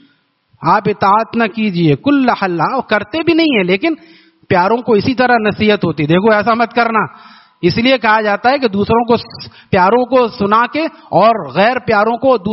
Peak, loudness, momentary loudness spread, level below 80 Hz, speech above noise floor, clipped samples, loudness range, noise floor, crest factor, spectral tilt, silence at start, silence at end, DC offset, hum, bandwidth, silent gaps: 0 dBFS; -13 LUFS; 5 LU; -48 dBFS; 43 dB; under 0.1%; 1 LU; -55 dBFS; 12 dB; -4 dB/octave; 0.6 s; 0 s; under 0.1%; none; 6 kHz; none